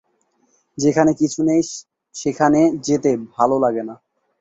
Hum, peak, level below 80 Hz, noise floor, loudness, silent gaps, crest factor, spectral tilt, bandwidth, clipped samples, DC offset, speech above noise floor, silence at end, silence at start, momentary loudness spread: none; -2 dBFS; -56 dBFS; -64 dBFS; -18 LUFS; none; 18 dB; -5.5 dB/octave; 8 kHz; under 0.1%; under 0.1%; 47 dB; 0.45 s; 0.75 s; 15 LU